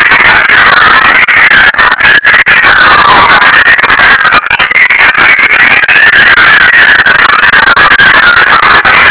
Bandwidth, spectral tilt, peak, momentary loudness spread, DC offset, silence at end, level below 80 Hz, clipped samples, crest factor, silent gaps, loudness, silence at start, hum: 4 kHz; -5.5 dB/octave; 0 dBFS; 2 LU; under 0.1%; 0 s; -32 dBFS; 40%; 2 dB; none; -1 LUFS; 0 s; none